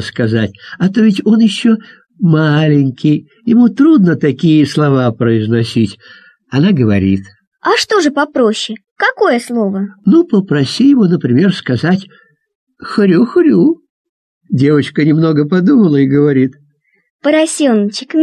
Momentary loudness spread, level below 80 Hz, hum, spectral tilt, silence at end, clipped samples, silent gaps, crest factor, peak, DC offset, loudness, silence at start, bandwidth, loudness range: 8 LU; -46 dBFS; none; -6.5 dB/octave; 0 s; under 0.1%; 7.47-7.51 s, 8.91-8.96 s, 12.55-12.67 s, 13.90-14.41 s, 17.10-17.19 s; 10 dB; 0 dBFS; under 0.1%; -12 LUFS; 0 s; 12 kHz; 3 LU